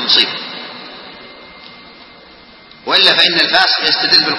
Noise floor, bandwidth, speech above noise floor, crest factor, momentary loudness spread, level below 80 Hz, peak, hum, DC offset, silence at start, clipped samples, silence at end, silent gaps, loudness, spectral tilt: -40 dBFS; 11 kHz; 28 dB; 16 dB; 23 LU; -58 dBFS; 0 dBFS; none; under 0.1%; 0 s; 0.1%; 0 s; none; -10 LUFS; -2.5 dB/octave